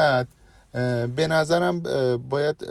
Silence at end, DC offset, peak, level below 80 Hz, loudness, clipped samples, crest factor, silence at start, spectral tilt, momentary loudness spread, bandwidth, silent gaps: 0 s; under 0.1%; -8 dBFS; -56 dBFS; -23 LUFS; under 0.1%; 16 dB; 0 s; -6 dB/octave; 7 LU; 12.5 kHz; none